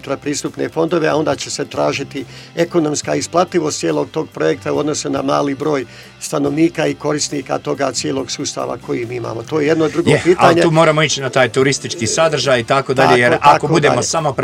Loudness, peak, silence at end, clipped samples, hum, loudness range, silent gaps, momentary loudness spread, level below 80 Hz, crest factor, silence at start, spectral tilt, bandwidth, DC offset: -15 LUFS; 0 dBFS; 0 s; under 0.1%; none; 6 LU; none; 11 LU; -50 dBFS; 16 dB; 0.05 s; -4.5 dB/octave; 15.5 kHz; under 0.1%